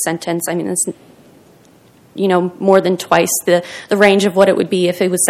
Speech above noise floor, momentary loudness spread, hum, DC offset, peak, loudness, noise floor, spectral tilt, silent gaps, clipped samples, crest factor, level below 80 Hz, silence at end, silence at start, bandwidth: 33 dB; 8 LU; none; under 0.1%; 0 dBFS; -14 LUFS; -47 dBFS; -4 dB/octave; none; 0.2%; 16 dB; -60 dBFS; 0 s; 0 s; 16 kHz